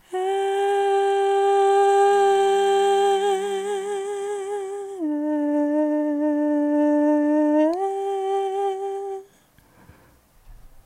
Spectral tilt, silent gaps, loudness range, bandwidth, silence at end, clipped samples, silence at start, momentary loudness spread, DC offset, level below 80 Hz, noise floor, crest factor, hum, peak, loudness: -3.5 dB/octave; none; 6 LU; 14.5 kHz; 0.2 s; under 0.1%; 0.1 s; 11 LU; under 0.1%; -60 dBFS; -56 dBFS; 12 dB; none; -10 dBFS; -21 LUFS